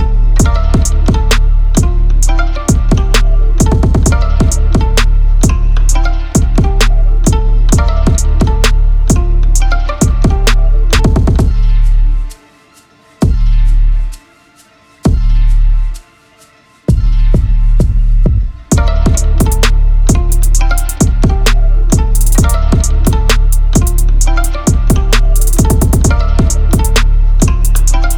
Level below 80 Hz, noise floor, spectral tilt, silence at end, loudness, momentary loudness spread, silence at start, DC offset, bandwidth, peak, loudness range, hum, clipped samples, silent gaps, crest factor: -8 dBFS; -44 dBFS; -5 dB/octave; 0 s; -12 LUFS; 3 LU; 0 s; under 0.1%; 17 kHz; 0 dBFS; 4 LU; none; under 0.1%; none; 8 dB